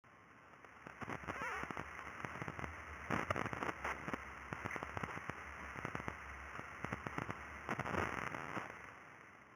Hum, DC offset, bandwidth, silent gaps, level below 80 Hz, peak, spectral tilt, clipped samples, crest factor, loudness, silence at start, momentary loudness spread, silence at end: none; under 0.1%; over 20 kHz; none; -62 dBFS; -20 dBFS; -5 dB/octave; under 0.1%; 26 dB; -45 LUFS; 0.05 s; 15 LU; 0 s